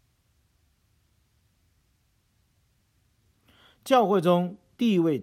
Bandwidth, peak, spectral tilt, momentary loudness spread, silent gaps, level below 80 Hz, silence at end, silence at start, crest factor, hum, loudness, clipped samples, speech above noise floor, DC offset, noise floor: 15.5 kHz; -8 dBFS; -7 dB/octave; 11 LU; none; -72 dBFS; 0 s; 3.85 s; 20 dB; none; -24 LUFS; under 0.1%; 47 dB; under 0.1%; -69 dBFS